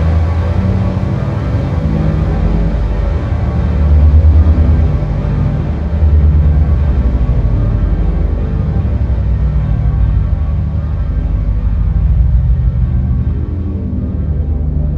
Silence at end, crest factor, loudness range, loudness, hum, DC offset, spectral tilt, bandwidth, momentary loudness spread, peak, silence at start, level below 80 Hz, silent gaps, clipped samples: 0 s; 12 dB; 3 LU; -14 LUFS; none; under 0.1%; -10 dB/octave; 4.7 kHz; 7 LU; 0 dBFS; 0 s; -14 dBFS; none; under 0.1%